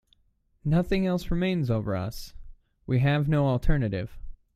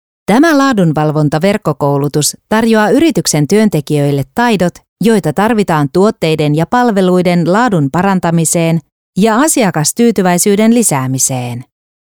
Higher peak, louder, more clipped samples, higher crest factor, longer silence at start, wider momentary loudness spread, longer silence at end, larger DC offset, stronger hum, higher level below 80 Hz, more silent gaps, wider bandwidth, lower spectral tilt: second, -8 dBFS vs 0 dBFS; second, -27 LUFS vs -11 LUFS; neither; first, 20 dB vs 10 dB; first, 0.65 s vs 0.3 s; first, 14 LU vs 5 LU; second, 0.2 s vs 0.45 s; second, under 0.1% vs 0.2%; neither; first, -36 dBFS vs -46 dBFS; second, none vs 4.88-4.96 s, 8.92-9.13 s; second, 15 kHz vs over 20 kHz; first, -8 dB/octave vs -5 dB/octave